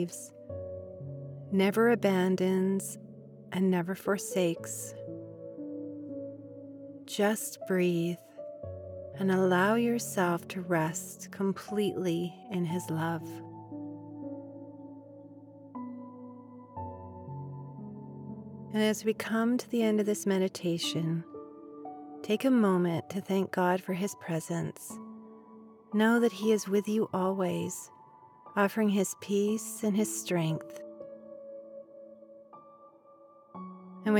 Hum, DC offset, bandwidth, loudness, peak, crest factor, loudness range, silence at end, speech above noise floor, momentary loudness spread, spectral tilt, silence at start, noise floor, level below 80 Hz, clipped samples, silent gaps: none; under 0.1%; 18.5 kHz; -30 LUFS; -14 dBFS; 18 dB; 14 LU; 0 s; 28 dB; 20 LU; -5.5 dB/octave; 0 s; -57 dBFS; -82 dBFS; under 0.1%; none